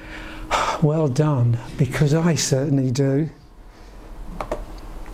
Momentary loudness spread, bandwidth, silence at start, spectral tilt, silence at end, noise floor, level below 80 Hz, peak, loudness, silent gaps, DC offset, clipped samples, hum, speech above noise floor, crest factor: 17 LU; 15 kHz; 0 s; -6 dB/octave; 0 s; -43 dBFS; -38 dBFS; -6 dBFS; -21 LUFS; none; under 0.1%; under 0.1%; none; 24 dB; 16 dB